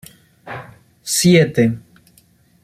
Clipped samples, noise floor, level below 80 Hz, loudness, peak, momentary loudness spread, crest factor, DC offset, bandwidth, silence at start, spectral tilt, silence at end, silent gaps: under 0.1%; -54 dBFS; -54 dBFS; -15 LUFS; -2 dBFS; 21 LU; 18 dB; under 0.1%; 15.5 kHz; 0.45 s; -5 dB/octave; 0.85 s; none